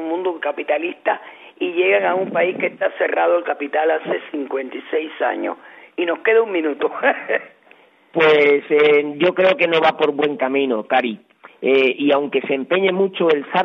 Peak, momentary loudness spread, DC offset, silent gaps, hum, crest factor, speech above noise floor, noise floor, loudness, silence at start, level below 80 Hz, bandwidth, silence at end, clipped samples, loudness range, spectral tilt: -2 dBFS; 10 LU; under 0.1%; none; none; 16 dB; 33 dB; -51 dBFS; -18 LUFS; 0 s; -72 dBFS; 6 kHz; 0 s; under 0.1%; 5 LU; -6.5 dB/octave